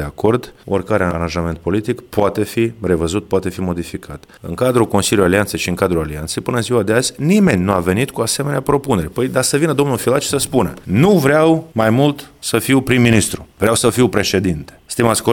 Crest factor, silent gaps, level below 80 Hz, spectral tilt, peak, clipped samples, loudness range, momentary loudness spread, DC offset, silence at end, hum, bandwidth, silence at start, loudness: 16 dB; none; -40 dBFS; -5 dB/octave; 0 dBFS; under 0.1%; 4 LU; 9 LU; under 0.1%; 0 s; none; 18 kHz; 0 s; -16 LUFS